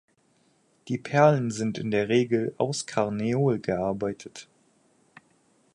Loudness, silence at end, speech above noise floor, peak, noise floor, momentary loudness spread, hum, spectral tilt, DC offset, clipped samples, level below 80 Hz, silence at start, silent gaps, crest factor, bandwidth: -26 LUFS; 1.3 s; 41 dB; -6 dBFS; -66 dBFS; 13 LU; none; -6 dB/octave; under 0.1%; under 0.1%; -62 dBFS; 0.85 s; none; 22 dB; 11.5 kHz